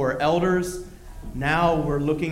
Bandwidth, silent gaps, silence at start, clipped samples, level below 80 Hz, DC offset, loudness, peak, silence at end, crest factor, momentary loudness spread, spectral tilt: 16 kHz; none; 0 s; under 0.1%; -40 dBFS; under 0.1%; -23 LUFS; -8 dBFS; 0 s; 16 dB; 17 LU; -6 dB/octave